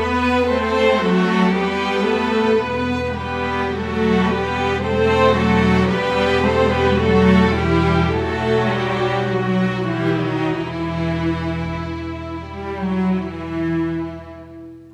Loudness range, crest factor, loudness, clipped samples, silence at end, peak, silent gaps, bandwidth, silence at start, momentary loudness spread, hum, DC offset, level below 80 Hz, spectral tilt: 7 LU; 16 dB; -18 LUFS; under 0.1%; 0.05 s; -2 dBFS; none; 10 kHz; 0 s; 11 LU; none; under 0.1%; -36 dBFS; -7 dB/octave